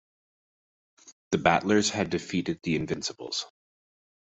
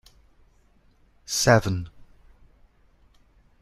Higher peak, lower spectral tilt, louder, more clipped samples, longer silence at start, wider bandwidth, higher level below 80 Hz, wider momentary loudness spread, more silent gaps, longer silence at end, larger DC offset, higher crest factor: second, -6 dBFS vs -2 dBFS; about the same, -4 dB/octave vs -4 dB/octave; second, -27 LUFS vs -22 LUFS; neither; second, 1.05 s vs 1.3 s; second, 8.2 kHz vs 14 kHz; second, -60 dBFS vs -52 dBFS; second, 10 LU vs 24 LU; first, 1.12-1.31 s vs none; second, 0.8 s vs 1.75 s; neither; about the same, 24 dB vs 26 dB